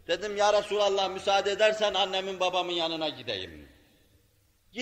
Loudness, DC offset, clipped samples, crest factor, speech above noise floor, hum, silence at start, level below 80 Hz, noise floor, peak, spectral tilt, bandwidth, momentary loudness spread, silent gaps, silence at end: -27 LUFS; under 0.1%; under 0.1%; 18 dB; 38 dB; none; 0.1 s; -64 dBFS; -66 dBFS; -10 dBFS; -2.5 dB/octave; 9.6 kHz; 10 LU; none; 0 s